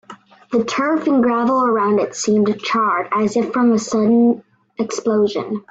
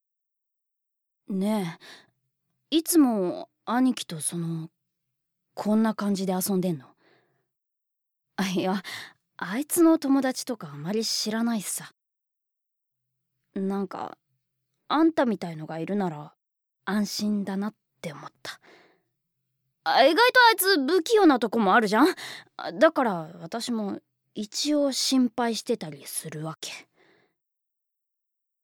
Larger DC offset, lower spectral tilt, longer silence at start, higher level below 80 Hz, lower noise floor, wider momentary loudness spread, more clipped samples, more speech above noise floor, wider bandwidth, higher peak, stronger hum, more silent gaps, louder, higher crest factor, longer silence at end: neither; about the same, -5 dB/octave vs -4 dB/octave; second, 0.1 s vs 1.3 s; first, -62 dBFS vs -74 dBFS; second, -41 dBFS vs -84 dBFS; second, 7 LU vs 19 LU; neither; second, 25 dB vs 59 dB; second, 8 kHz vs 18 kHz; about the same, -6 dBFS vs -6 dBFS; neither; neither; first, -17 LUFS vs -25 LUFS; second, 12 dB vs 20 dB; second, 0.1 s vs 1.8 s